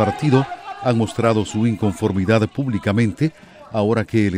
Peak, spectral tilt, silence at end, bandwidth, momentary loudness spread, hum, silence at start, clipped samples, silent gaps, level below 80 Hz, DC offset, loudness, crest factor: -2 dBFS; -7 dB/octave; 0 s; 11.5 kHz; 6 LU; none; 0 s; under 0.1%; none; -50 dBFS; under 0.1%; -19 LUFS; 16 dB